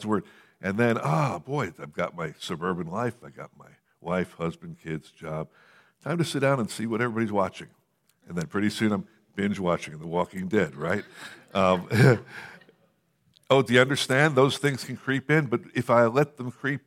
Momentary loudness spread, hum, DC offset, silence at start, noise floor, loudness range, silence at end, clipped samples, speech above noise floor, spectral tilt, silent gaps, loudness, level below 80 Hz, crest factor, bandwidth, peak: 16 LU; none; under 0.1%; 0 s; -68 dBFS; 9 LU; 0.05 s; under 0.1%; 42 dB; -6 dB/octave; none; -26 LUFS; -64 dBFS; 22 dB; 15.5 kHz; -4 dBFS